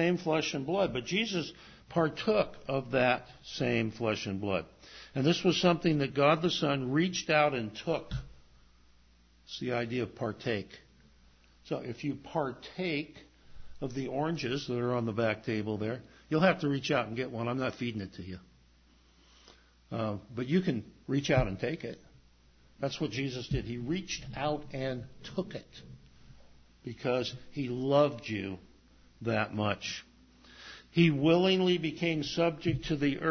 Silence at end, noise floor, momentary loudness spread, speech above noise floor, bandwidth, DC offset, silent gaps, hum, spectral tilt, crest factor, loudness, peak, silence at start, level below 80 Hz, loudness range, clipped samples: 0 s; -63 dBFS; 15 LU; 32 dB; 6.6 kHz; under 0.1%; none; none; -6 dB/octave; 20 dB; -32 LUFS; -12 dBFS; 0 s; -56 dBFS; 9 LU; under 0.1%